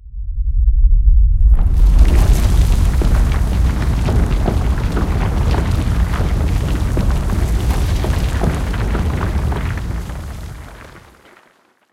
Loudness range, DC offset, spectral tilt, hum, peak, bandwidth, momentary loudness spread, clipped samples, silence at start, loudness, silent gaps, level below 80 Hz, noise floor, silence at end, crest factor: 6 LU; under 0.1%; -6.5 dB/octave; none; 0 dBFS; 14.5 kHz; 10 LU; under 0.1%; 0.05 s; -17 LUFS; none; -14 dBFS; -54 dBFS; 0.95 s; 14 dB